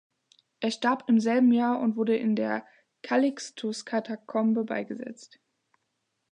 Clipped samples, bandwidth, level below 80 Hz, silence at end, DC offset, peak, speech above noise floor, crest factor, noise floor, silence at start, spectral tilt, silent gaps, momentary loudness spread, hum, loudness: under 0.1%; 10 kHz; -82 dBFS; 1.05 s; under 0.1%; -12 dBFS; 53 dB; 16 dB; -79 dBFS; 0.6 s; -5.5 dB/octave; none; 12 LU; none; -27 LUFS